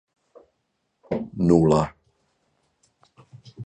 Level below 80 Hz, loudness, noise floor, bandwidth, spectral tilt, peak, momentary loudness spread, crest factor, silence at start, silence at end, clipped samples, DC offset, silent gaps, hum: -48 dBFS; -22 LUFS; -75 dBFS; 9.4 kHz; -8.5 dB/octave; -4 dBFS; 14 LU; 22 dB; 1.1 s; 0 s; under 0.1%; under 0.1%; none; none